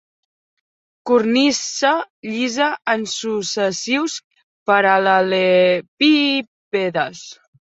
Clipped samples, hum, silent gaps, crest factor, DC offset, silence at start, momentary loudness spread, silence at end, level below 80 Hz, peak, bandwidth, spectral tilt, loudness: under 0.1%; none; 2.10-2.23 s, 4.24-4.30 s, 4.43-4.66 s, 5.88-5.97 s, 6.47-6.72 s; 16 dB; under 0.1%; 1.05 s; 12 LU; 0.4 s; -66 dBFS; -2 dBFS; 8.2 kHz; -3.5 dB/octave; -18 LUFS